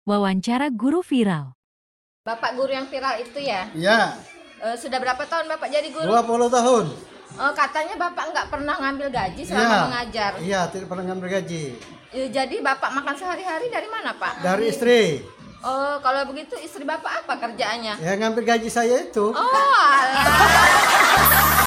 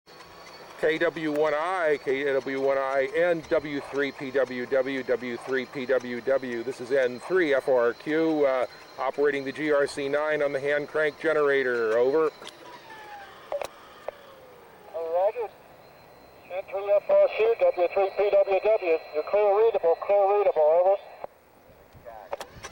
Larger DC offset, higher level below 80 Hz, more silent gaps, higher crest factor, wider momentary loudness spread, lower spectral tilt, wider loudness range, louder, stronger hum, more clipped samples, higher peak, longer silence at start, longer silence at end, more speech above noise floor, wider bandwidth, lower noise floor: neither; first, -44 dBFS vs -64 dBFS; first, 1.55-2.24 s vs none; first, 20 dB vs 12 dB; second, 16 LU vs 19 LU; second, -3.5 dB/octave vs -5 dB/octave; about the same, 8 LU vs 8 LU; first, -20 LUFS vs -25 LUFS; neither; neither; first, -2 dBFS vs -14 dBFS; about the same, 0.05 s vs 0.1 s; about the same, 0 s vs 0.05 s; first, over 69 dB vs 30 dB; about the same, 16.5 kHz vs 17 kHz; first, under -90 dBFS vs -55 dBFS